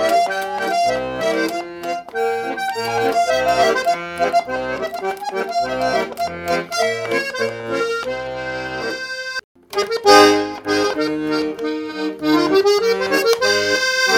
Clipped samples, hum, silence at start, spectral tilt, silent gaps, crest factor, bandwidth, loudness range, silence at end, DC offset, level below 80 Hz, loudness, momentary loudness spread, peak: under 0.1%; none; 0 s; -3 dB/octave; 9.44-9.55 s; 18 dB; 17.5 kHz; 5 LU; 0 s; under 0.1%; -52 dBFS; -19 LUFS; 10 LU; 0 dBFS